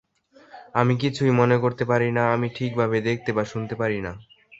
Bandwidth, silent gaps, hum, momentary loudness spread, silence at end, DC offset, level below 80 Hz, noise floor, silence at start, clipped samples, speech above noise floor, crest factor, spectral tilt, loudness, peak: 7.8 kHz; none; none; 7 LU; 0.05 s; under 0.1%; -56 dBFS; -55 dBFS; 0.55 s; under 0.1%; 32 dB; 20 dB; -7.5 dB/octave; -23 LUFS; -2 dBFS